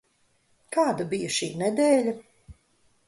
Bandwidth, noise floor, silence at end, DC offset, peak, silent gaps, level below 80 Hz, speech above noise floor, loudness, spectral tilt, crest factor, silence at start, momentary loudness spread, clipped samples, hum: 11.5 kHz; -67 dBFS; 0.55 s; under 0.1%; -10 dBFS; none; -62 dBFS; 43 dB; -25 LUFS; -4 dB/octave; 18 dB; 0.7 s; 9 LU; under 0.1%; none